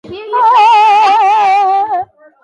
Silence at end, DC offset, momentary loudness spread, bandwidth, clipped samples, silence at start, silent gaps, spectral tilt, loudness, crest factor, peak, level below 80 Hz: 0.4 s; under 0.1%; 12 LU; 10.5 kHz; under 0.1%; 0.05 s; none; -2 dB/octave; -9 LUFS; 8 dB; -2 dBFS; -58 dBFS